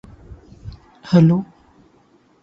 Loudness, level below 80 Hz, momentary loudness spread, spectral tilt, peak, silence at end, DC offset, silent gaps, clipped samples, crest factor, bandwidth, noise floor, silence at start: -16 LUFS; -48 dBFS; 26 LU; -9 dB/octave; -2 dBFS; 1 s; under 0.1%; none; under 0.1%; 20 dB; 6.6 kHz; -55 dBFS; 0.65 s